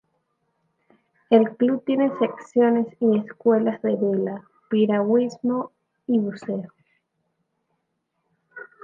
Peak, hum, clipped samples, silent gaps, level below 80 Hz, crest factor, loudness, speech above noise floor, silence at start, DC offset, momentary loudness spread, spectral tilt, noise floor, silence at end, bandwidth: -4 dBFS; none; under 0.1%; none; -74 dBFS; 20 dB; -22 LUFS; 55 dB; 1.3 s; under 0.1%; 14 LU; -8 dB/octave; -76 dBFS; 0.2 s; 7.4 kHz